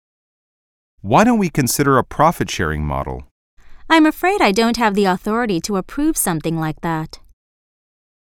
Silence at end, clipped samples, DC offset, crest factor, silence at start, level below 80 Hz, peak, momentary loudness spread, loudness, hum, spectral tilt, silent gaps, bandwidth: 1.2 s; under 0.1%; under 0.1%; 18 dB; 1.05 s; -38 dBFS; -2 dBFS; 10 LU; -17 LUFS; none; -5 dB/octave; 3.31-3.57 s; 18 kHz